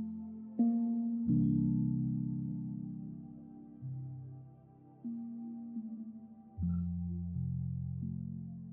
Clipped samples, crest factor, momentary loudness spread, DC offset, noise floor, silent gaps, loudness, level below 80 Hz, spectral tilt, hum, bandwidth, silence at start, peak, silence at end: under 0.1%; 16 dB; 18 LU; under 0.1%; -58 dBFS; none; -37 LUFS; -58 dBFS; -15.5 dB/octave; none; 1.4 kHz; 0 s; -22 dBFS; 0 s